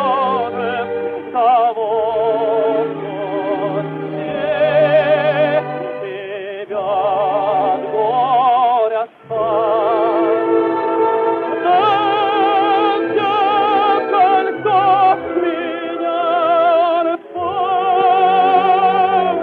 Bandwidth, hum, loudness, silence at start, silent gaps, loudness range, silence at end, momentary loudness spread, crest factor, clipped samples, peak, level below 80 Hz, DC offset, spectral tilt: 4.7 kHz; none; -16 LUFS; 0 s; none; 3 LU; 0 s; 10 LU; 14 dB; under 0.1%; -2 dBFS; -60 dBFS; under 0.1%; -8 dB/octave